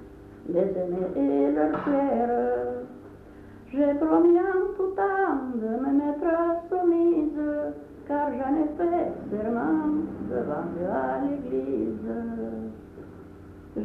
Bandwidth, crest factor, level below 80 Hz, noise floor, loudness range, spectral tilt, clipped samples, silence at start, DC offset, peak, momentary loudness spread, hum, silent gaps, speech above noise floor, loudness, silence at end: 3.9 kHz; 16 dB; -54 dBFS; -46 dBFS; 5 LU; -9.5 dB/octave; under 0.1%; 0 s; under 0.1%; -10 dBFS; 16 LU; none; none; 21 dB; -26 LUFS; 0 s